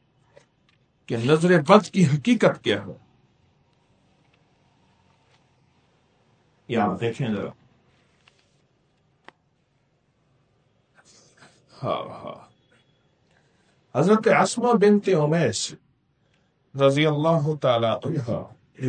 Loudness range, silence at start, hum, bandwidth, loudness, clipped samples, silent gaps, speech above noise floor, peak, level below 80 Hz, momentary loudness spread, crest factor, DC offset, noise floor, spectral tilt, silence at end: 16 LU; 1.1 s; none; 9.4 kHz; -22 LUFS; under 0.1%; none; 46 dB; 0 dBFS; -66 dBFS; 14 LU; 24 dB; under 0.1%; -67 dBFS; -6 dB/octave; 0 s